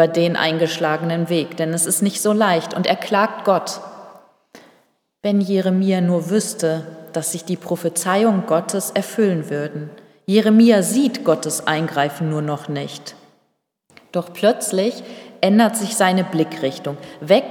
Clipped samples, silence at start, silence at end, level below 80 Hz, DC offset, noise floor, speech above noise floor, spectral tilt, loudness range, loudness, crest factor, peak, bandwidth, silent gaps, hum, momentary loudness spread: under 0.1%; 0 s; 0 s; -78 dBFS; under 0.1%; -69 dBFS; 50 dB; -4.5 dB/octave; 5 LU; -19 LUFS; 18 dB; -2 dBFS; 18 kHz; none; none; 12 LU